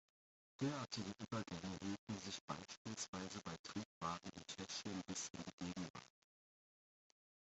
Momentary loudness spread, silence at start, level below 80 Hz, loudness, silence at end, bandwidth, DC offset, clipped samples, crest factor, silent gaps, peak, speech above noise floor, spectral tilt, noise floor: 5 LU; 0.6 s; -78 dBFS; -48 LUFS; 1.35 s; 8.2 kHz; under 0.1%; under 0.1%; 20 dB; 1.99-2.07 s, 2.41-2.48 s, 2.77-2.85 s, 3.08-3.13 s, 3.59-3.64 s, 3.85-4.01 s, 5.53-5.58 s, 5.90-5.94 s; -30 dBFS; over 41 dB; -4 dB/octave; under -90 dBFS